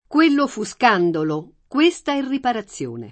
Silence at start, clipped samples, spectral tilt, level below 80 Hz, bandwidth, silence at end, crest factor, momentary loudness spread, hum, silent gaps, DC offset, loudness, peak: 0.1 s; under 0.1%; -5 dB/octave; -60 dBFS; 8.8 kHz; 0 s; 18 dB; 11 LU; none; none; under 0.1%; -20 LUFS; -2 dBFS